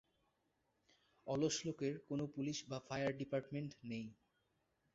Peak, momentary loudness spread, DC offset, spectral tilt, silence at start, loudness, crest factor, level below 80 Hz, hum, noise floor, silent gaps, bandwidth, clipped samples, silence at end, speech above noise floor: -26 dBFS; 9 LU; under 0.1%; -5.5 dB/octave; 1.25 s; -43 LUFS; 20 dB; -76 dBFS; none; -83 dBFS; none; 7.6 kHz; under 0.1%; 0.8 s; 41 dB